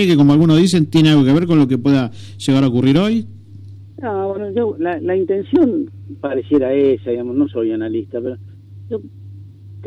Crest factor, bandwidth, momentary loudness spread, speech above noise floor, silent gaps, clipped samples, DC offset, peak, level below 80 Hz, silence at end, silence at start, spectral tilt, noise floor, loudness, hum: 12 dB; 12 kHz; 16 LU; 21 dB; none; under 0.1%; under 0.1%; -4 dBFS; -52 dBFS; 0 s; 0 s; -7 dB/octave; -36 dBFS; -16 LUFS; none